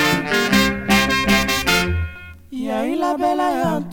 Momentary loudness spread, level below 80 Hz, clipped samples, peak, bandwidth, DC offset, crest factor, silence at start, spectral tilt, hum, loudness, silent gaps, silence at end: 12 LU; -36 dBFS; under 0.1%; -2 dBFS; 19 kHz; under 0.1%; 18 dB; 0 s; -4 dB/octave; none; -18 LUFS; none; 0 s